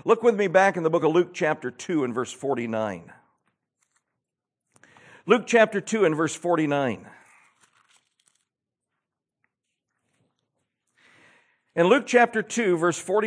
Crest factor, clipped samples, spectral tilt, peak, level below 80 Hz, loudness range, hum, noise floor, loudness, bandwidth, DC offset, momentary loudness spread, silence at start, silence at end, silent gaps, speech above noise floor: 22 dB; under 0.1%; -5 dB/octave; -4 dBFS; -80 dBFS; 8 LU; none; -86 dBFS; -23 LUFS; 10.5 kHz; under 0.1%; 10 LU; 0.05 s; 0 s; none; 63 dB